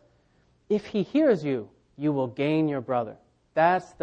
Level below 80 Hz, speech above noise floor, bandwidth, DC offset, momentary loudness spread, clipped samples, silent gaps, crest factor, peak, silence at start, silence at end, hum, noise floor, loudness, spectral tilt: -66 dBFS; 40 dB; 8.4 kHz; under 0.1%; 9 LU; under 0.1%; none; 18 dB; -8 dBFS; 0.7 s; 0.15 s; none; -64 dBFS; -26 LUFS; -8 dB/octave